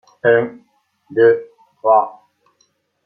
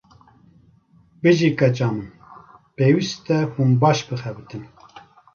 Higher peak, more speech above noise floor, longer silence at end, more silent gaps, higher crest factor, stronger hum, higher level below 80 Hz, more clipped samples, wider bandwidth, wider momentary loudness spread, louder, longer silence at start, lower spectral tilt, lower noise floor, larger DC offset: about the same, -2 dBFS vs -2 dBFS; first, 49 dB vs 36 dB; first, 0.95 s vs 0.35 s; neither; about the same, 16 dB vs 18 dB; neither; second, -68 dBFS vs -58 dBFS; neither; second, 4.7 kHz vs 7 kHz; second, 12 LU vs 18 LU; first, -16 LUFS vs -20 LUFS; second, 0.25 s vs 1.25 s; first, -8 dB/octave vs -6.5 dB/octave; first, -63 dBFS vs -55 dBFS; neither